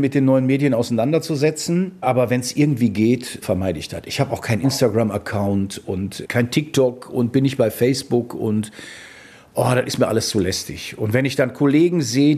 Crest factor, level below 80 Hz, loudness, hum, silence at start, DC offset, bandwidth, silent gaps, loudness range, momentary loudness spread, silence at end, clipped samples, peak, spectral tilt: 16 dB; -52 dBFS; -20 LUFS; none; 0 s; under 0.1%; 14.5 kHz; none; 3 LU; 9 LU; 0 s; under 0.1%; -2 dBFS; -6 dB/octave